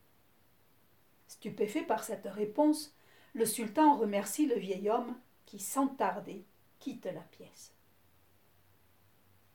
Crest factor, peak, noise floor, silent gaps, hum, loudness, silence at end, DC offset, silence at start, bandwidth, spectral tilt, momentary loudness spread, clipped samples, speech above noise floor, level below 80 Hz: 20 dB; -14 dBFS; -69 dBFS; none; none; -33 LUFS; 1.9 s; under 0.1%; 1.3 s; 19 kHz; -4.5 dB/octave; 22 LU; under 0.1%; 36 dB; -82 dBFS